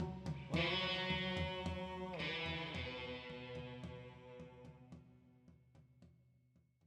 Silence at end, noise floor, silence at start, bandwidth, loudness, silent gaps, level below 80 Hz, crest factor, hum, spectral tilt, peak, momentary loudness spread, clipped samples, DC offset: 0.75 s; -74 dBFS; 0 s; 11.5 kHz; -42 LUFS; none; -60 dBFS; 18 dB; none; -5.5 dB/octave; -26 dBFS; 20 LU; under 0.1%; under 0.1%